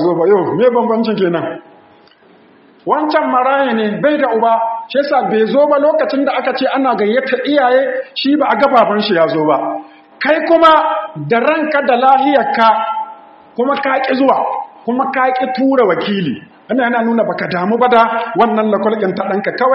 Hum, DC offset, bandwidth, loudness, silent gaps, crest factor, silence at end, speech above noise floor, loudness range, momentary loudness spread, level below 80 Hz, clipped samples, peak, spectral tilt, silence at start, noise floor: none; under 0.1%; 5.8 kHz; -13 LUFS; none; 14 dB; 0 s; 33 dB; 3 LU; 9 LU; -62 dBFS; under 0.1%; 0 dBFS; -3.5 dB/octave; 0 s; -46 dBFS